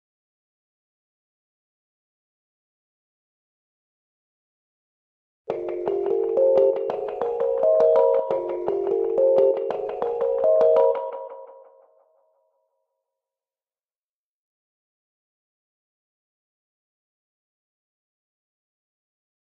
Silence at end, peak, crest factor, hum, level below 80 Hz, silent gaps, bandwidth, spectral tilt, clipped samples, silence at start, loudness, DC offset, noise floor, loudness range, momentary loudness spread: 8.05 s; -8 dBFS; 20 dB; none; -68 dBFS; none; 4.8 kHz; -7.5 dB/octave; under 0.1%; 5.5 s; -22 LUFS; under 0.1%; under -90 dBFS; 11 LU; 11 LU